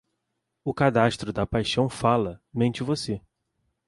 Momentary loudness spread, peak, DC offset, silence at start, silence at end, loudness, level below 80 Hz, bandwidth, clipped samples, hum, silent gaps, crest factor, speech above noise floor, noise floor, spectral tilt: 11 LU; -6 dBFS; under 0.1%; 0.65 s; 0.7 s; -25 LUFS; -48 dBFS; 11.5 kHz; under 0.1%; none; none; 20 dB; 55 dB; -80 dBFS; -6 dB/octave